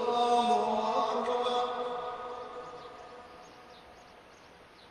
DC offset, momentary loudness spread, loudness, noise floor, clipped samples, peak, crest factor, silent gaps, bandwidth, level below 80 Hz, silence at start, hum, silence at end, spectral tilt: under 0.1%; 25 LU; -30 LUFS; -55 dBFS; under 0.1%; -16 dBFS; 18 dB; none; 10.5 kHz; -68 dBFS; 0 s; none; 0 s; -3.5 dB/octave